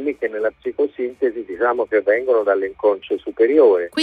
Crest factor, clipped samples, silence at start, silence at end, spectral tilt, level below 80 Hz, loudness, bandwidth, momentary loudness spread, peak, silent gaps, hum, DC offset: 16 dB; under 0.1%; 0 s; 0 s; -4.5 dB/octave; -60 dBFS; -19 LUFS; 4.7 kHz; 10 LU; -2 dBFS; none; none; under 0.1%